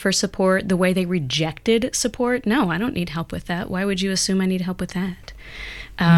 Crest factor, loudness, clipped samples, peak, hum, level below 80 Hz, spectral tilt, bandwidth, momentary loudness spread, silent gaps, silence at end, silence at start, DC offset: 16 dB; -22 LUFS; under 0.1%; -6 dBFS; none; -44 dBFS; -4.5 dB/octave; 15 kHz; 11 LU; none; 0 s; 0 s; under 0.1%